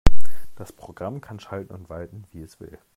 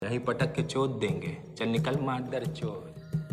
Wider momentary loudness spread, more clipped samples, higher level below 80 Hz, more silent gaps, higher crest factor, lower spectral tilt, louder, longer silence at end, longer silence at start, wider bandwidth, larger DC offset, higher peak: about the same, 10 LU vs 8 LU; neither; first, -30 dBFS vs -58 dBFS; neither; about the same, 16 dB vs 14 dB; about the same, -6.5 dB/octave vs -6.5 dB/octave; second, -35 LUFS vs -31 LUFS; about the same, 0 s vs 0 s; about the same, 0.05 s vs 0 s; second, 10 kHz vs 13 kHz; neither; first, 0 dBFS vs -16 dBFS